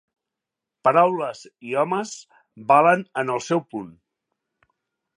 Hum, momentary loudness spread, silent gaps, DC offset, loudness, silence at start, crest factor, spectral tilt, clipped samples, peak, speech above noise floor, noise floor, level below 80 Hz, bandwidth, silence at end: none; 19 LU; none; under 0.1%; -21 LUFS; 0.85 s; 22 dB; -5.5 dB/octave; under 0.1%; -2 dBFS; 65 dB; -86 dBFS; -74 dBFS; 10.5 kHz; 1.3 s